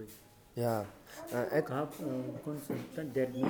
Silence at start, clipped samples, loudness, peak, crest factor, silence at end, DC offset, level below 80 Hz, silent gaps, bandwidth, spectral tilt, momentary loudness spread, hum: 0 s; under 0.1%; -37 LUFS; -18 dBFS; 18 dB; 0 s; under 0.1%; -70 dBFS; none; over 20 kHz; -6.5 dB/octave; 14 LU; none